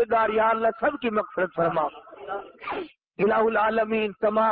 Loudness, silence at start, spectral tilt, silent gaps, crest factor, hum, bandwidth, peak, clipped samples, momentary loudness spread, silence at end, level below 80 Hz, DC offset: -24 LUFS; 0 s; -10 dB/octave; none; 12 dB; none; 4.8 kHz; -12 dBFS; under 0.1%; 14 LU; 0 s; -60 dBFS; under 0.1%